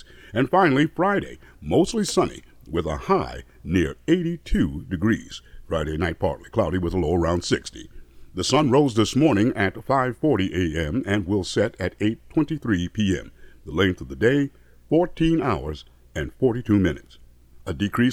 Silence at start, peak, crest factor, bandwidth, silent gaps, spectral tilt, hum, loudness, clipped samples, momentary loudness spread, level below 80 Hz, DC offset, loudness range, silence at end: 0.35 s; -4 dBFS; 18 dB; 14.5 kHz; none; -6 dB/octave; none; -23 LUFS; under 0.1%; 13 LU; -40 dBFS; under 0.1%; 3 LU; 0 s